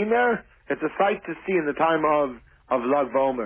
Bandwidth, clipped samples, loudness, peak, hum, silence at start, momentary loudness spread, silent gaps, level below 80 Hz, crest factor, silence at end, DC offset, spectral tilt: 3.7 kHz; under 0.1%; -24 LUFS; -8 dBFS; none; 0 s; 8 LU; none; -58 dBFS; 14 dB; 0 s; under 0.1%; -9.5 dB/octave